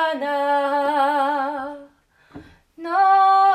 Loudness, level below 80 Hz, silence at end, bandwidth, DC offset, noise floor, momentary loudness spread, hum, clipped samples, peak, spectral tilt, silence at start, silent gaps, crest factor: -19 LUFS; -66 dBFS; 0 s; 13 kHz; under 0.1%; -54 dBFS; 18 LU; none; under 0.1%; -8 dBFS; -4 dB/octave; 0 s; none; 12 dB